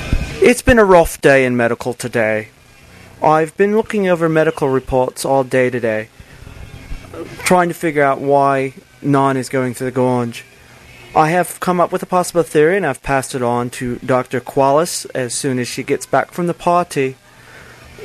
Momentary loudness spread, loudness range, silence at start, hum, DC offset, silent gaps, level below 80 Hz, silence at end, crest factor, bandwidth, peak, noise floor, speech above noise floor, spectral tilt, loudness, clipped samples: 11 LU; 4 LU; 0 s; none; under 0.1%; none; -34 dBFS; 0 s; 16 dB; 13.5 kHz; 0 dBFS; -42 dBFS; 27 dB; -5.5 dB/octave; -16 LUFS; under 0.1%